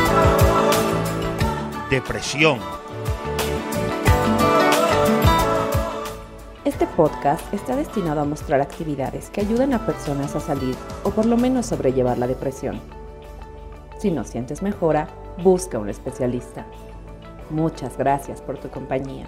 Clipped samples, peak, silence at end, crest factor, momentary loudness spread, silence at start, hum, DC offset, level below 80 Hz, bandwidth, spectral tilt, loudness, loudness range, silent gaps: under 0.1%; -2 dBFS; 0 s; 18 dB; 18 LU; 0 s; none; under 0.1%; -34 dBFS; 16 kHz; -5.5 dB/octave; -21 LUFS; 6 LU; none